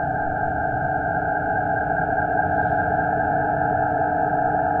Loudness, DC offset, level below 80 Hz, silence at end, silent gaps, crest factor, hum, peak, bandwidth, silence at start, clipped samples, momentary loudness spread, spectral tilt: -22 LUFS; under 0.1%; -44 dBFS; 0 s; none; 12 dB; none; -8 dBFS; 3.4 kHz; 0 s; under 0.1%; 2 LU; -10.5 dB/octave